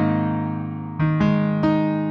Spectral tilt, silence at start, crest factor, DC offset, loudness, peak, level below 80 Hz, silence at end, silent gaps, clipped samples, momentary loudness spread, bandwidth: -9.5 dB/octave; 0 s; 14 dB; under 0.1%; -21 LUFS; -8 dBFS; -48 dBFS; 0 s; none; under 0.1%; 8 LU; 6.2 kHz